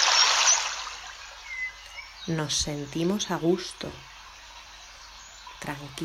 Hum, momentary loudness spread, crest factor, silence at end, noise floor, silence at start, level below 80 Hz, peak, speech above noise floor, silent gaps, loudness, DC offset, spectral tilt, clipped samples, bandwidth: none; 25 LU; 22 dB; 0 s; -47 dBFS; 0 s; -54 dBFS; -6 dBFS; 17 dB; none; -25 LUFS; under 0.1%; -2 dB/octave; under 0.1%; 16 kHz